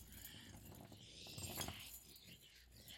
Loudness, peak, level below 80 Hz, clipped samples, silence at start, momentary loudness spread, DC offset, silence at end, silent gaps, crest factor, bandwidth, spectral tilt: -53 LUFS; -30 dBFS; -68 dBFS; under 0.1%; 0 s; 14 LU; under 0.1%; 0 s; none; 26 dB; 16.5 kHz; -2.5 dB/octave